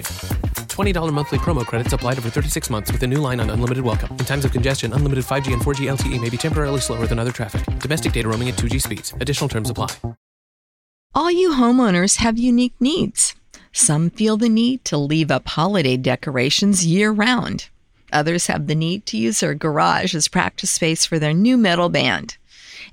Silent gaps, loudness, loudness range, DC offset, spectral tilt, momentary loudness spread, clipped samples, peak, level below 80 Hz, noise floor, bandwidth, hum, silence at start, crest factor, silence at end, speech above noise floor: 10.17-11.10 s; -19 LUFS; 5 LU; under 0.1%; -4.5 dB/octave; 9 LU; under 0.1%; -2 dBFS; -32 dBFS; -40 dBFS; 16.5 kHz; none; 0 s; 18 dB; 0.05 s; 22 dB